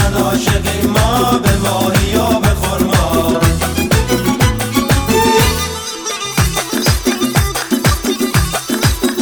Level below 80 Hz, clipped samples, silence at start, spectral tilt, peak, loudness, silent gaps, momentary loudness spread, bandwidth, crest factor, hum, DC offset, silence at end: -22 dBFS; under 0.1%; 0 s; -4.5 dB/octave; 0 dBFS; -14 LUFS; none; 4 LU; over 20 kHz; 14 dB; none; under 0.1%; 0 s